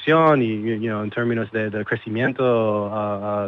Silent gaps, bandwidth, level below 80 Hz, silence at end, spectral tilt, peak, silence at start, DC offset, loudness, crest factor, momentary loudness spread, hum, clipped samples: none; 6.6 kHz; -64 dBFS; 0 s; -9 dB/octave; -4 dBFS; 0 s; under 0.1%; -21 LUFS; 16 dB; 8 LU; none; under 0.1%